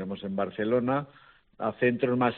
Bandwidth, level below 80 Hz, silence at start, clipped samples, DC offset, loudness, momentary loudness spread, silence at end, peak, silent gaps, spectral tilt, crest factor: 4.3 kHz; -66 dBFS; 0 s; under 0.1%; under 0.1%; -28 LUFS; 8 LU; 0 s; -10 dBFS; none; -5.5 dB/octave; 18 dB